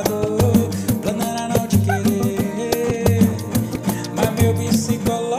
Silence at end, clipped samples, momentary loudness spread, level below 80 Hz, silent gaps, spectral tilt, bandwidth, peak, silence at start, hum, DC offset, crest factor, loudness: 0 s; under 0.1%; 6 LU; -40 dBFS; none; -6 dB/octave; 16 kHz; -6 dBFS; 0 s; none; under 0.1%; 14 dB; -19 LUFS